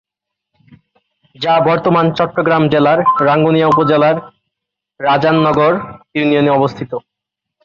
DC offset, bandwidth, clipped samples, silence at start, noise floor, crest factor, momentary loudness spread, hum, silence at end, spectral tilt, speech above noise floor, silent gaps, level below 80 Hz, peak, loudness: under 0.1%; 7 kHz; under 0.1%; 1.4 s; -80 dBFS; 12 dB; 10 LU; none; 0.65 s; -8 dB/octave; 68 dB; none; -52 dBFS; -2 dBFS; -13 LUFS